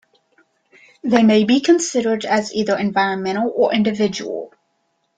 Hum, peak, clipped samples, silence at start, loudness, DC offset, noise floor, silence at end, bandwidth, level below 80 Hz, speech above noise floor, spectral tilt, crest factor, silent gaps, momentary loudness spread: none; -2 dBFS; under 0.1%; 1.05 s; -18 LUFS; under 0.1%; -68 dBFS; 0.7 s; 9.2 kHz; -60 dBFS; 51 dB; -4.5 dB/octave; 18 dB; none; 13 LU